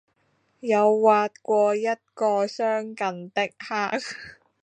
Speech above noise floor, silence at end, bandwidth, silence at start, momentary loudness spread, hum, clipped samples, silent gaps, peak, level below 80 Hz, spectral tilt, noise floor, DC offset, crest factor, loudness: 45 dB; 0.3 s; 9.6 kHz; 0.65 s; 12 LU; none; under 0.1%; none; -6 dBFS; -74 dBFS; -4.5 dB/octave; -68 dBFS; under 0.1%; 20 dB; -24 LUFS